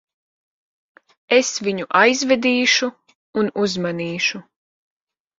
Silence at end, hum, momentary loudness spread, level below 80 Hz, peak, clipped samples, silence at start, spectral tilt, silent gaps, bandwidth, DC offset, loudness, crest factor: 1 s; none; 9 LU; -66 dBFS; 0 dBFS; under 0.1%; 1.3 s; -3 dB/octave; 3.15-3.33 s; 7.8 kHz; under 0.1%; -18 LUFS; 20 dB